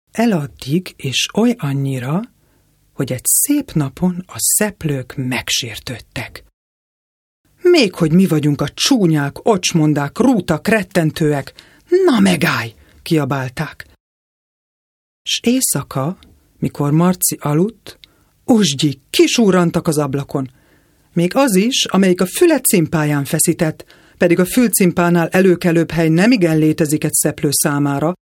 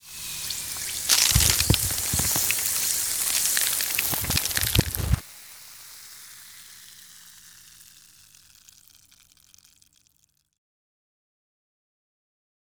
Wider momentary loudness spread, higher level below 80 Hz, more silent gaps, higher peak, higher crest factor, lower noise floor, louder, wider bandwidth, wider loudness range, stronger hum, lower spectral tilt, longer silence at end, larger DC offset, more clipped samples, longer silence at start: second, 12 LU vs 24 LU; second, -48 dBFS vs -40 dBFS; first, 6.53-7.44 s, 14.00-15.25 s vs none; about the same, 0 dBFS vs 0 dBFS; second, 16 dB vs 28 dB; second, -56 dBFS vs -68 dBFS; first, -15 LUFS vs -22 LUFS; second, 18 kHz vs over 20 kHz; second, 6 LU vs 23 LU; neither; first, -4.5 dB/octave vs -1.5 dB/octave; second, 0.15 s vs 4.9 s; neither; neither; about the same, 0.15 s vs 0.05 s